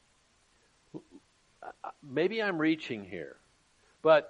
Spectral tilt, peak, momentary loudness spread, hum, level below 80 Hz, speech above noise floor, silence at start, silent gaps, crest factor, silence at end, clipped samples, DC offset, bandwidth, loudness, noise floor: -6.5 dB/octave; -12 dBFS; 21 LU; none; -76 dBFS; 39 dB; 0.95 s; none; 22 dB; 0 s; under 0.1%; under 0.1%; 9 kHz; -31 LUFS; -68 dBFS